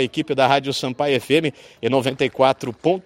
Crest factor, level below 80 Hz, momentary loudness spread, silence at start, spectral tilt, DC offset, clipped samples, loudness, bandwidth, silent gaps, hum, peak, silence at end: 20 dB; -60 dBFS; 6 LU; 0 s; -5 dB/octave; under 0.1%; under 0.1%; -20 LUFS; 16 kHz; none; none; 0 dBFS; 0.05 s